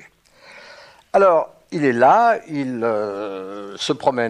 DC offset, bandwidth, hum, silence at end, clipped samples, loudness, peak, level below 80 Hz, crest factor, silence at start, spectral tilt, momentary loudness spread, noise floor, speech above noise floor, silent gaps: under 0.1%; 11 kHz; none; 0 s; under 0.1%; -18 LUFS; -4 dBFS; -66 dBFS; 16 dB; 0.55 s; -5.5 dB/octave; 15 LU; -49 dBFS; 31 dB; none